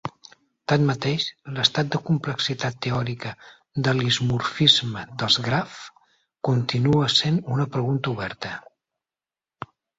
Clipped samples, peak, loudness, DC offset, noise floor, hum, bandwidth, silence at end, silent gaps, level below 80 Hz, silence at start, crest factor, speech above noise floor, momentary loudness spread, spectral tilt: under 0.1%; -2 dBFS; -22 LUFS; under 0.1%; under -90 dBFS; none; 8 kHz; 1.4 s; none; -56 dBFS; 0.05 s; 22 dB; over 67 dB; 17 LU; -5 dB/octave